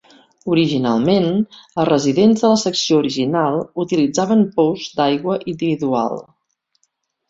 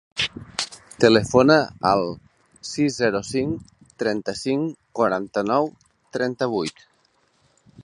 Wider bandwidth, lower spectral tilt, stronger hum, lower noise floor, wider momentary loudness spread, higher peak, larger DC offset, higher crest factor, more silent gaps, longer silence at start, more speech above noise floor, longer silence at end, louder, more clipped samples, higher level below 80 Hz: second, 7.8 kHz vs 11.5 kHz; about the same, -5.5 dB/octave vs -5 dB/octave; neither; first, -68 dBFS vs -64 dBFS; second, 8 LU vs 15 LU; about the same, -2 dBFS vs -2 dBFS; neither; second, 16 dB vs 22 dB; neither; first, 0.45 s vs 0.15 s; first, 51 dB vs 43 dB; first, 1.05 s vs 0 s; first, -17 LUFS vs -22 LUFS; neither; about the same, -58 dBFS vs -54 dBFS